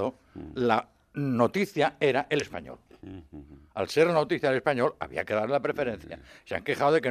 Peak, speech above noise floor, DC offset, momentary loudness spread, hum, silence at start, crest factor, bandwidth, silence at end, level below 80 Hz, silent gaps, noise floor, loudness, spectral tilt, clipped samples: -8 dBFS; 21 dB; under 0.1%; 21 LU; none; 0 s; 20 dB; 14.5 kHz; 0 s; -60 dBFS; none; -48 dBFS; -27 LUFS; -6 dB/octave; under 0.1%